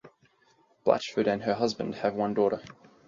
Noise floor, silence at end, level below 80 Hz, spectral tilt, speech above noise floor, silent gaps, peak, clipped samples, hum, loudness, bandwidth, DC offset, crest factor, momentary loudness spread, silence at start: -65 dBFS; 0.35 s; -66 dBFS; -5.5 dB/octave; 38 dB; none; -8 dBFS; under 0.1%; none; -28 LUFS; 7.6 kHz; under 0.1%; 22 dB; 4 LU; 0.05 s